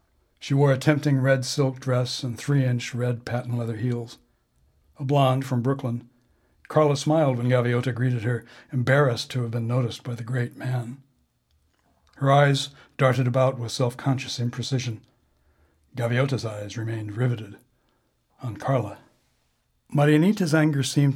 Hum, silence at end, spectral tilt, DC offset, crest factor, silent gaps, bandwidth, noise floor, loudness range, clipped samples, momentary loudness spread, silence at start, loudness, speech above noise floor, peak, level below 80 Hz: none; 0 s; -6.5 dB/octave; under 0.1%; 20 dB; none; 14 kHz; -69 dBFS; 6 LU; under 0.1%; 12 LU; 0.4 s; -24 LUFS; 46 dB; -4 dBFS; -66 dBFS